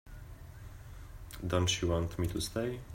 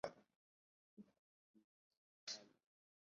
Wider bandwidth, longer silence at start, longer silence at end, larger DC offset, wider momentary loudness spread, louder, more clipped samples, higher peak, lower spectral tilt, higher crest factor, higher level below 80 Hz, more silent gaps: first, 16 kHz vs 7.2 kHz; about the same, 0.05 s vs 0.05 s; second, 0 s vs 0.65 s; neither; first, 20 LU vs 16 LU; first, -34 LUFS vs -53 LUFS; neither; first, -14 dBFS vs -28 dBFS; first, -4.5 dB/octave vs -1 dB/octave; second, 22 dB vs 32 dB; first, -48 dBFS vs under -90 dBFS; second, none vs 0.36-0.97 s, 1.19-1.54 s, 1.64-1.90 s, 1.97-2.27 s